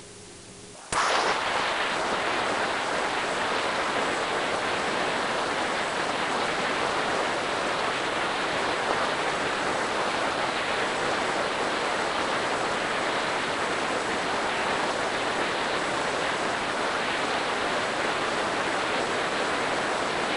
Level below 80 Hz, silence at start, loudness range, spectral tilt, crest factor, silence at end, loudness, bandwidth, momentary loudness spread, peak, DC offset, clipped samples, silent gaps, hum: -56 dBFS; 0 s; 0 LU; -2.5 dB/octave; 20 dB; 0 s; -26 LUFS; 11 kHz; 1 LU; -8 dBFS; under 0.1%; under 0.1%; none; none